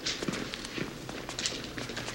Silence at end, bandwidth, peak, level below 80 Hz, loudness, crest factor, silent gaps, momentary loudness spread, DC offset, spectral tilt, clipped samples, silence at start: 0 s; 16 kHz; -10 dBFS; -54 dBFS; -35 LUFS; 26 dB; none; 5 LU; under 0.1%; -2.5 dB/octave; under 0.1%; 0 s